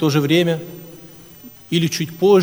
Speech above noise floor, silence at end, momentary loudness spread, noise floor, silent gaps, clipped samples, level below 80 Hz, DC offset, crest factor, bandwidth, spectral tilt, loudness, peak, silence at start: 25 dB; 0 s; 24 LU; -41 dBFS; none; under 0.1%; -58 dBFS; under 0.1%; 16 dB; over 20 kHz; -5.5 dB/octave; -18 LUFS; -2 dBFS; 0 s